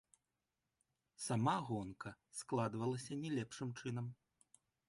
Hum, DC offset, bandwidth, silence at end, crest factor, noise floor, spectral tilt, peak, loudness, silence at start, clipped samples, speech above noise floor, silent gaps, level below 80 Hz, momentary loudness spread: none; under 0.1%; 11.5 kHz; 0.75 s; 20 dB; -90 dBFS; -5.5 dB/octave; -24 dBFS; -43 LUFS; 1.2 s; under 0.1%; 49 dB; none; -76 dBFS; 12 LU